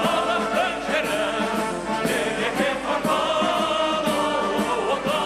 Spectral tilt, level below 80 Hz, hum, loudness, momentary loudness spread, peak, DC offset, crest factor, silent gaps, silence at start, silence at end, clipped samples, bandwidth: -3.5 dB/octave; -50 dBFS; none; -23 LUFS; 3 LU; -8 dBFS; under 0.1%; 14 dB; none; 0 s; 0 s; under 0.1%; 15 kHz